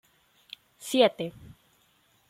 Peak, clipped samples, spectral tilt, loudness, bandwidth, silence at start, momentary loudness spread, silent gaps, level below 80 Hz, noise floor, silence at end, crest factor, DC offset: -8 dBFS; under 0.1%; -4 dB/octave; -26 LUFS; 16 kHz; 0.8 s; 24 LU; none; -68 dBFS; -66 dBFS; 1 s; 22 dB; under 0.1%